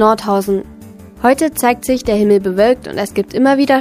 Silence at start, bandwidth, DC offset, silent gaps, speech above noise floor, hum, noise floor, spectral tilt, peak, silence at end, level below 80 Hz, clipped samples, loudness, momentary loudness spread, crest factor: 0 s; 15.5 kHz; under 0.1%; none; 23 dB; none; -36 dBFS; -5 dB/octave; 0 dBFS; 0 s; -42 dBFS; under 0.1%; -14 LUFS; 7 LU; 14 dB